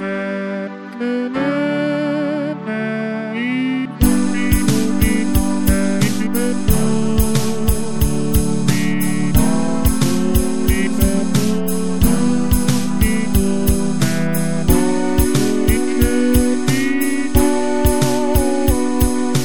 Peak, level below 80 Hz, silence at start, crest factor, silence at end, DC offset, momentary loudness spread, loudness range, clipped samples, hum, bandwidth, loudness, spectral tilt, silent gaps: 0 dBFS; -24 dBFS; 0 s; 16 dB; 0 s; 8%; 5 LU; 2 LU; under 0.1%; none; 17.5 kHz; -17 LUFS; -5.5 dB/octave; none